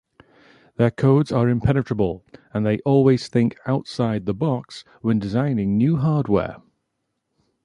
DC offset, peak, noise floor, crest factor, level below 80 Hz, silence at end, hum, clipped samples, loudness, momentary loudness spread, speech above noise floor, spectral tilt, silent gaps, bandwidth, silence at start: under 0.1%; -4 dBFS; -76 dBFS; 18 dB; -46 dBFS; 1.05 s; none; under 0.1%; -21 LUFS; 11 LU; 56 dB; -8.5 dB/octave; none; 10.5 kHz; 0.8 s